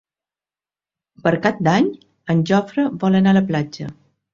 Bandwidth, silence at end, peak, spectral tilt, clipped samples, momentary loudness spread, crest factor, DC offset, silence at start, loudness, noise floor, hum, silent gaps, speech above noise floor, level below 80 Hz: 7.2 kHz; 0.4 s; -2 dBFS; -7.5 dB/octave; under 0.1%; 14 LU; 18 dB; under 0.1%; 1.25 s; -18 LUFS; under -90 dBFS; none; none; over 73 dB; -56 dBFS